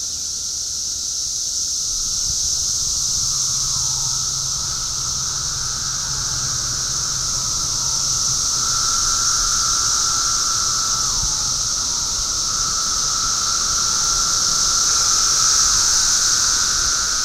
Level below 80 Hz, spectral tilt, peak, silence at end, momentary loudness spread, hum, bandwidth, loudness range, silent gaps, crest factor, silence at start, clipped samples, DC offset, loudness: -38 dBFS; 1 dB/octave; -4 dBFS; 0 s; 7 LU; none; 16 kHz; 5 LU; none; 16 dB; 0 s; under 0.1%; under 0.1%; -17 LUFS